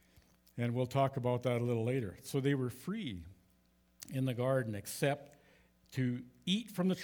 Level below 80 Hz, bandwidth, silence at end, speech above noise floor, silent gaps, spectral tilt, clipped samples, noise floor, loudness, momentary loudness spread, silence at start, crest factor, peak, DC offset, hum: -70 dBFS; over 20 kHz; 0 s; 36 dB; none; -6 dB/octave; under 0.1%; -71 dBFS; -36 LUFS; 10 LU; 0.55 s; 18 dB; -18 dBFS; under 0.1%; none